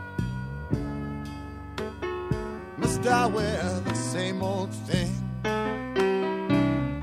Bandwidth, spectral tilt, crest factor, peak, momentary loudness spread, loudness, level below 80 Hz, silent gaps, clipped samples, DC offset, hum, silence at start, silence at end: 15 kHz; -6 dB/octave; 20 dB; -8 dBFS; 12 LU; -28 LUFS; -44 dBFS; none; under 0.1%; under 0.1%; none; 0 s; 0 s